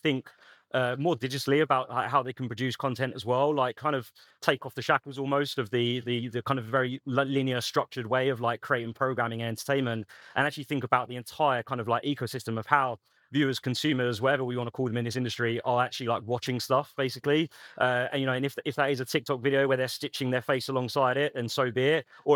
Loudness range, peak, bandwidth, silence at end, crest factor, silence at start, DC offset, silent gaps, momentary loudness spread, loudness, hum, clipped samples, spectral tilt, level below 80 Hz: 1 LU; -6 dBFS; 19 kHz; 0 s; 22 dB; 0.05 s; under 0.1%; none; 6 LU; -29 LUFS; none; under 0.1%; -5.5 dB/octave; -78 dBFS